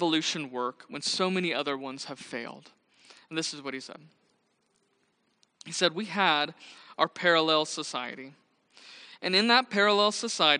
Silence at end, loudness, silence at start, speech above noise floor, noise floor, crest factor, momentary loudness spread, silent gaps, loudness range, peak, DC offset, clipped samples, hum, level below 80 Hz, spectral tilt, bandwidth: 0 s; -27 LUFS; 0 s; 44 dB; -72 dBFS; 24 dB; 19 LU; none; 13 LU; -6 dBFS; under 0.1%; under 0.1%; none; -84 dBFS; -3 dB/octave; 10 kHz